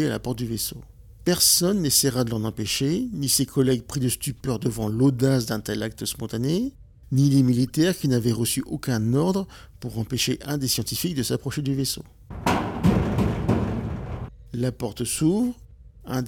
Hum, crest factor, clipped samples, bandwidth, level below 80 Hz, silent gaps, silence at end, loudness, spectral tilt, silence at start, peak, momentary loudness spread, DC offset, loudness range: none; 20 dB; under 0.1%; 18 kHz; -42 dBFS; none; 0 s; -24 LUFS; -4.5 dB/octave; 0 s; -4 dBFS; 11 LU; under 0.1%; 4 LU